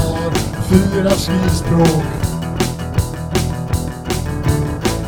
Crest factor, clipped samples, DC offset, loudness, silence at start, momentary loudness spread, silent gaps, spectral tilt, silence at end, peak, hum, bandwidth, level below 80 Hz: 16 dB; under 0.1%; under 0.1%; -17 LUFS; 0 s; 7 LU; none; -6 dB/octave; 0 s; 0 dBFS; none; over 20 kHz; -28 dBFS